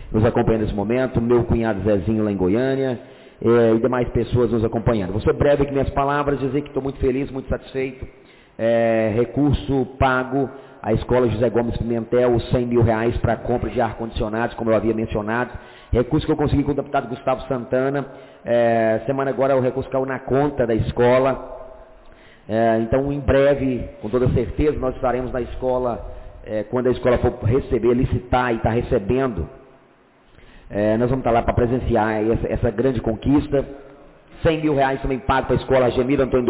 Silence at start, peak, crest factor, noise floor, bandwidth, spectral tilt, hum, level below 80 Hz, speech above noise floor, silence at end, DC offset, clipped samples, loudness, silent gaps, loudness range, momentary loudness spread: 0 s; -8 dBFS; 12 dB; -53 dBFS; 4 kHz; -11.5 dB/octave; none; -34 dBFS; 34 dB; 0 s; under 0.1%; under 0.1%; -20 LUFS; none; 3 LU; 8 LU